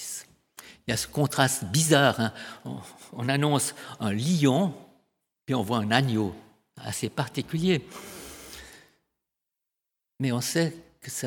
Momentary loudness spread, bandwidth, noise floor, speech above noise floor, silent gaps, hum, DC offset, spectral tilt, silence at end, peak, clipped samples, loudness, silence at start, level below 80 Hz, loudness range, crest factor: 19 LU; 19 kHz; -86 dBFS; 60 dB; none; none; under 0.1%; -4.5 dB/octave; 0 s; -2 dBFS; under 0.1%; -26 LUFS; 0 s; -62 dBFS; 8 LU; 26 dB